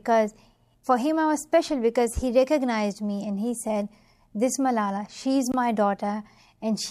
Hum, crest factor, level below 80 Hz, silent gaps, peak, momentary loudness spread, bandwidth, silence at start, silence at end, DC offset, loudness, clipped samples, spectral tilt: none; 16 dB; -48 dBFS; none; -8 dBFS; 8 LU; 14.5 kHz; 0.05 s; 0 s; under 0.1%; -25 LUFS; under 0.1%; -5 dB/octave